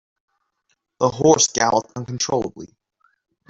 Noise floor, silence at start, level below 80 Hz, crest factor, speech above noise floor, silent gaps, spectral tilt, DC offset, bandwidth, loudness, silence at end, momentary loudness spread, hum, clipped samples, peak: -71 dBFS; 1 s; -56 dBFS; 20 dB; 52 dB; none; -3.5 dB/octave; under 0.1%; 8 kHz; -19 LUFS; 0.85 s; 12 LU; none; under 0.1%; -2 dBFS